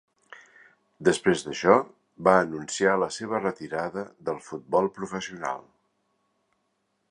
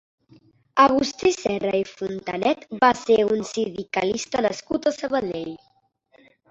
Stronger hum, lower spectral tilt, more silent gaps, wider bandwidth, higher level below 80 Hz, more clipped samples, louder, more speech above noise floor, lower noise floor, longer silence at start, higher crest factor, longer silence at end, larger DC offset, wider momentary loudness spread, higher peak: neither; about the same, -4.5 dB/octave vs -4 dB/octave; neither; first, 11 kHz vs 8.2 kHz; second, -64 dBFS vs -58 dBFS; neither; second, -26 LUFS vs -23 LUFS; first, 49 dB vs 40 dB; first, -75 dBFS vs -62 dBFS; first, 1 s vs 0.75 s; first, 26 dB vs 20 dB; first, 1.5 s vs 0.95 s; neither; about the same, 12 LU vs 12 LU; about the same, -2 dBFS vs -2 dBFS